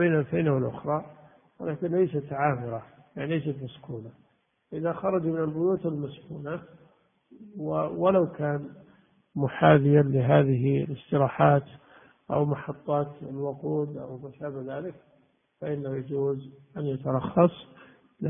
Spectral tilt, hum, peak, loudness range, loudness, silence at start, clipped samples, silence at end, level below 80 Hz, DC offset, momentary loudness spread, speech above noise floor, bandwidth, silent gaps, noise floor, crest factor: -12 dB/octave; none; -4 dBFS; 10 LU; -27 LUFS; 0 s; under 0.1%; 0 s; -62 dBFS; under 0.1%; 17 LU; 39 dB; 3.7 kHz; none; -66 dBFS; 24 dB